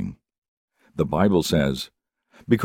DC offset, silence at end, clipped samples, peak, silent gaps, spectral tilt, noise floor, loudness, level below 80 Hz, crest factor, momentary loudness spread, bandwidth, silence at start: under 0.1%; 0 s; under 0.1%; -4 dBFS; 0.38-0.42 s, 0.48-0.68 s; -6 dB/octave; -57 dBFS; -22 LUFS; -46 dBFS; 20 dB; 16 LU; 17 kHz; 0 s